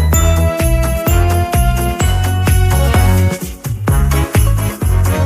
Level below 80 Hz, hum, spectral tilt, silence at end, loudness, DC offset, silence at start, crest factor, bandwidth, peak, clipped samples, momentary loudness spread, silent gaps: -16 dBFS; none; -5.5 dB/octave; 0 s; -14 LUFS; under 0.1%; 0 s; 10 dB; 16 kHz; -2 dBFS; under 0.1%; 4 LU; none